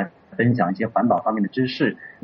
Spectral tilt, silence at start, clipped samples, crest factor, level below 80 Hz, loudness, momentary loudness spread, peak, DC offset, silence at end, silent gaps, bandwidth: -5.5 dB/octave; 0 s; under 0.1%; 16 dB; -64 dBFS; -22 LUFS; 4 LU; -6 dBFS; under 0.1%; 0.1 s; none; 6 kHz